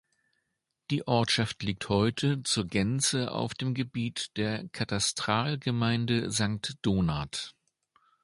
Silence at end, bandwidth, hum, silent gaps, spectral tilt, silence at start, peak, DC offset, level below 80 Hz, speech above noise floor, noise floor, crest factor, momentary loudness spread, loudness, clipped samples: 0.75 s; 11.5 kHz; none; none; -4.5 dB/octave; 0.9 s; -10 dBFS; under 0.1%; -54 dBFS; 53 dB; -82 dBFS; 20 dB; 7 LU; -29 LUFS; under 0.1%